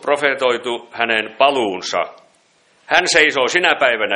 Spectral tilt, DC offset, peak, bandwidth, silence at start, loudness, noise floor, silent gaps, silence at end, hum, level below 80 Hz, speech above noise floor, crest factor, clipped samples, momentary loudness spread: -1.5 dB/octave; under 0.1%; 0 dBFS; 11 kHz; 0.05 s; -16 LUFS; -56 dBFS; none; 0 s; none; -58 dBFS; 40 dB; 18 dB; under 0.1%; 9 LU